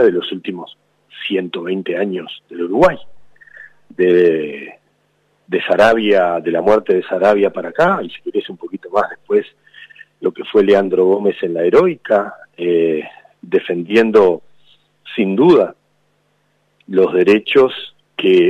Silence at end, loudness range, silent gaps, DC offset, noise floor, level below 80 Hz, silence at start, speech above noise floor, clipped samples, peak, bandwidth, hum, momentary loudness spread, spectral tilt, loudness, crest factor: 0 s; 4 LU; none; under 0.1%; -62 dBFS; -54 dBFS; 0 s; 47 dB; under 0.1%; -2 dBFS; 9 kHz; 50 Hz at -55 dBFS; 15 LU; -6.5 dB/octave; -15 LUFS; 14 dB